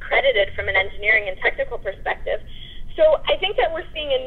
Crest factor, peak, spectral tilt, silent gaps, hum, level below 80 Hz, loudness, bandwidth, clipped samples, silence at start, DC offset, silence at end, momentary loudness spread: 16 dB; -6 dBFS; -5.5 dB/octave; none; none; -36 dBFS; -20 LUFS; 4.4 kHz; under 0.1%; 0 s; under 0.1%; 0 s; 11 LU